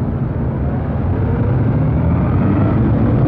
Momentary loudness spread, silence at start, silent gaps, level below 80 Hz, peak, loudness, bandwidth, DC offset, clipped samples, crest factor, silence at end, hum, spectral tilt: 5 LU; 0 s; none; -24 dBFS; -4 dBFS; -16 LUFS; 4.2 kHz; under 0.1%; under 0.1%; 10 dB; 0 s; none; -12.5 dB/octave